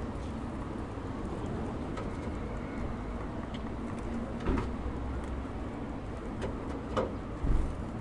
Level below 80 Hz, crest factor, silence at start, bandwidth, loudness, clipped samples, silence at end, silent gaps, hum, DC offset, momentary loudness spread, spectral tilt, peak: -40 dBFS; 18 dB; 0 s; 11 kHz; -37 LUFS; under 0.1%; 0 s; none; none; under 0.1%; 5 LU; -7.5 dB/octave; -16 dBFS